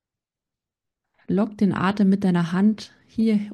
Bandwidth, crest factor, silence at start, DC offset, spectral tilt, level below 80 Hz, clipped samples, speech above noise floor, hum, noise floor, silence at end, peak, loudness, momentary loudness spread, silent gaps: 9.4 kHz; 12 dB; 1.3 s; under 0.1%; -8 dB/octave; -62 dBFS; under 0.1%; 67 dB; none; -88 dBFS; 0 s; -10 dBFS; -22 LUFS; 7 LU; none